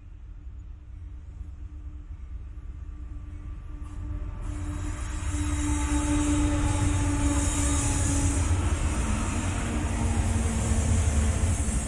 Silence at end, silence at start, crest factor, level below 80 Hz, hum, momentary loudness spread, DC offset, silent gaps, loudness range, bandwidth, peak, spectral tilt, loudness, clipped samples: 0 s; 0 s; 16 dB; -32 dBFS; none; 18 LU; under 0.1%; none; 16 LU; 11.5 kHz; -12 dBFS; -5 dB/octave; -27 LUFS; under 0.1%